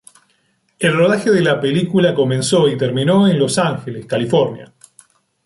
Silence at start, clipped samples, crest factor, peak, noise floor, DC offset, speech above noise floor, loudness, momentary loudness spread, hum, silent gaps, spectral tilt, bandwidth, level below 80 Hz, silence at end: 0.8 s; under 0.1%; 14 dB; -2 dBFS; -62 dBFS; under 0.1%; 47 dB; -15 LUFS; 8 LU; none; none; -5.5 dB/octave; 11.5 kHz; -56 dBFS; 0.8 s